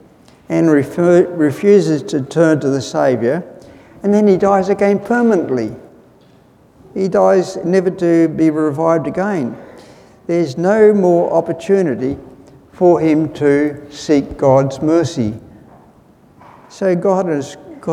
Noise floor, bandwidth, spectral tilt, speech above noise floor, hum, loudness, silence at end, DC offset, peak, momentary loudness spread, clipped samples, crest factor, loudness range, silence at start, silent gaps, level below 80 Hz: -48 dBFS; 12 kHz; -7 dB/octave; 34 dB; none; -14 LUFS; 0 s; under 0.1%; 0 dBFS; 11 LU; under 0.1%; 14 dB; 3 LU; 0.5 s; none; -50 dBFS